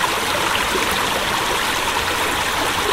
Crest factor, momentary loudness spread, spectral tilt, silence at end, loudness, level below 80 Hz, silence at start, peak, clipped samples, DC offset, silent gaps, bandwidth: 16 dB; 1 LU; -1.5 dB/octave; 0 s; -18 LUFS; -40 dBFS; 0 s; -4 dBFS; under 0.1%; under 0.1%; none; 16 kHz